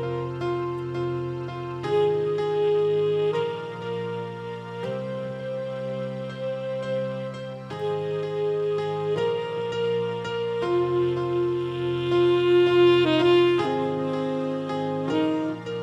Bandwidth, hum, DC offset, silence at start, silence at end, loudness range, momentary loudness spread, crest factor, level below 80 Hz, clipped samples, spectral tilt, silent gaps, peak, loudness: 8.4 kHz; none; under 0.1%; 0 s; 0 s; 10 LU; 13 LU; 16 dB; -62 dBFS; under 0.1%; -7.5 dB/octave; none; -8 dBFS; -25 LUFS